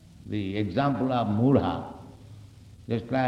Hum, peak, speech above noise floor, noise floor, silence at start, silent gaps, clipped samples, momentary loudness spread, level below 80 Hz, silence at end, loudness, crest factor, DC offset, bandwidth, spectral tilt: none; -8 dBFS; 23 dB; -48 dBFS; 0.15 s; none; under 0.1%; 22 LU; -54 dBFS; 0 s; -27 LUFS; 18 dB; under 0.1%; 8.8 kHz; -8.5 dB/octave